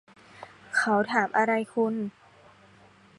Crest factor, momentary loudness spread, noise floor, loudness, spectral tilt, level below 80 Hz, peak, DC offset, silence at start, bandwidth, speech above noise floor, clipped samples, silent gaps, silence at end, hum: 20 dB; 23 LU; -56 dBFS; -26 LUFS; -5 dB/octave; -72 dBFS; -8 dBFS; under 0.1%; 0.4 s; 11.5 kHz; 30 dB; under 0.1%; none; 1.1 s; none